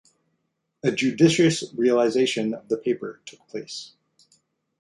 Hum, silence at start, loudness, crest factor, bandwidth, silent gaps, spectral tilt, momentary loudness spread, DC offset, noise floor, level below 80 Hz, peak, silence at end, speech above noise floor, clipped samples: none; 0.85 s; -22 LUFS; 20 dB; 11.5 kHz; none; -5 dB/octave; 18 LU; under 0.1%; -75 dBFS; -66 dBFS; -4 dBFS; 0.95 s; 53 dB; under 0.1%